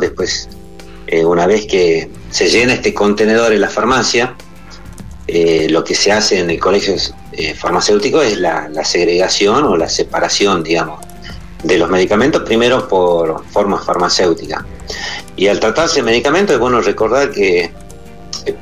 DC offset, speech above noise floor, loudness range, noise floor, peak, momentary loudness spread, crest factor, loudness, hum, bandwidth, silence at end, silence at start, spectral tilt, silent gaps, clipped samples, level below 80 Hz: 2%; 22 dB; 2 LU; -34 dBFS; -2 dBFS; 12 LU; 12 dB; -13 LUFS; none; 13 kHz; 0 s; 0 s; -3.5 dB/octave; none; under 0.1%; -38 dBFS